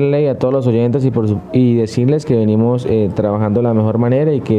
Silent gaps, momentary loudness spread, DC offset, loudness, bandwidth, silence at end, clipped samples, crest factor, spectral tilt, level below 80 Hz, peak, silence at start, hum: none; 2 LU; under 0.1%; -14 LUFS; 9.2 kHz; 0 s; under 0.1%; 12 dB; -9 dB/octave; -46 dBFS; -2 dBFS; 0 s; none